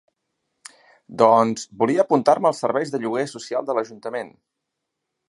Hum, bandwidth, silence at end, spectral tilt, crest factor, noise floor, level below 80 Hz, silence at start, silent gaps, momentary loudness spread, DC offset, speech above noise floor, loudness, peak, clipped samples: none; 11.5 kHz; 1 s; -5.5 dB/octave; 20 dB; -80 dBFS; -72 dBFS; 1.1 s; none; 14 LU; under 0.1%; 60 dB; -21 LUFS; -2 dBFS; under 0.1%